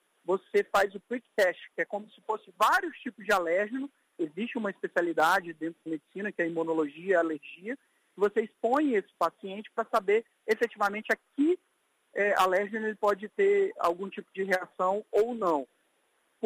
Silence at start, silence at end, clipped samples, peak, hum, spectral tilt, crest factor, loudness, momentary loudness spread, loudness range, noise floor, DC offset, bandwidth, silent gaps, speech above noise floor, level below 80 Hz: 0.3 s; 0 s; under 0.1%; -12 dBFS; none; -4.5 dB/octave; 18 dB; -29 LUFS; 13 LU; 2 LU; -72 dBFS; under 0.1%; 15.5 kHz; none; 43 dB; -72 dBFS